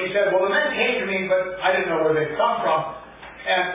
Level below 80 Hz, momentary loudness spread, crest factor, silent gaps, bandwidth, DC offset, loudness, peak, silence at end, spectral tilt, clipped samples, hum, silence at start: -56 dBFS; 10 LU; 14 dB; none; 3.9 kHz; under 0.1%; -21 LUFS; -8 dBFS; 0 s; -8 dB/octave; under 0.1%; none; 0 s